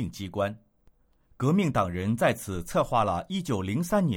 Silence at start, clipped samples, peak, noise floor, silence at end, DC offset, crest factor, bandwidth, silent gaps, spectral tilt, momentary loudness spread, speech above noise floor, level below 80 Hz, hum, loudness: 0 s; under 0.1%; -10 dBFS; -63 dBFS; 0 s; under 0.1%; 16 dB; 18 kHz; none; -6.5 dB/octave; 7 LU; 36 dB; -52 dBFS; none; -28 LUFS